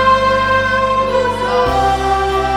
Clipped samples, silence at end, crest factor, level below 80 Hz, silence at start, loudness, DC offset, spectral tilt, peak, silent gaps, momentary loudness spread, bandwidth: under 0.1%; 0 s; 12 dB; -30 dBFS; 0 s; -14 LUFS; under 0.1%; -4.5 dB/octave; -2 dBFS; none; 3 LU; 14 kHz